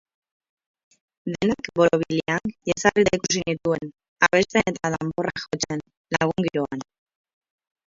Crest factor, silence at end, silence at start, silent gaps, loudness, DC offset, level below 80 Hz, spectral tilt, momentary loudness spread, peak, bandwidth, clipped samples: 24 dB; 1.1 s; 1.25 s; 4.08-4.16 s, 5.97-6.04 s; -23 LUFS; under 0.1%; -54 dBFS; -4.5 dB/octave; 10 LU; 0 dBFS; 7.8 kHz; under 0.1%